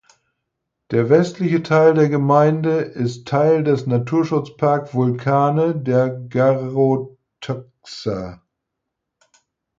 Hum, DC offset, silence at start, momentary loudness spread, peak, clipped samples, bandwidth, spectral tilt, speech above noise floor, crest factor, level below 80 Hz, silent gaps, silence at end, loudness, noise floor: none; under 0.1%; 0.9 s; 14 LU; -2 dBFS; under 0.1%; 7.6 kHz; -8 dB/octave; 62 dB; 16 dB; -58 dBFS; none; 1.45 s; -18 LUFS; -79 dBFS